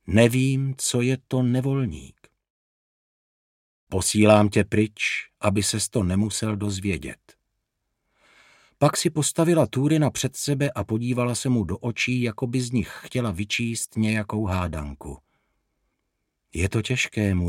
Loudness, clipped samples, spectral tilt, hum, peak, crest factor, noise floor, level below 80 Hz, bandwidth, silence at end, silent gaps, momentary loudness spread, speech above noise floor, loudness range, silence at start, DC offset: -23 LUFS; under 0.1%; -5 dB/octave; none; -2 dBFS; 22 dB; -78 dBFS; -48 dBFS; 16.5 kHz; 0 s; 2.50-3.87 s; 9 LU; 55 dB; 6 LU; 0.05 s; under 0.1%